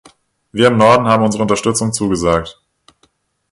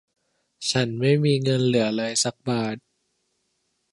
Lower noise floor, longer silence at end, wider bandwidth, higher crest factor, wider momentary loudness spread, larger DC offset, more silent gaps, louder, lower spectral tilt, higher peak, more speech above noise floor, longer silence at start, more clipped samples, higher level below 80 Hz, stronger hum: second, -59 dBFS vs -73 dBFS; second, 1 s vs 1.15 s; about the same, 11.5 kHz vs 11.5 kHz; about the same, 16 dB vs 16 dB; about the same, 9 LU vs 8 LU; neither; neither; first, -13 LUFS vs -23 LUFS; about the same, -5 dB/octave vs -5 dB/octave; first, 0 dBFS vs -8 dBFS; second, 46 dB vs 51 dB; about the same, 0.55 s vs 0.6 s; neither; first, -42 dBFS vs -64 dBFS; neither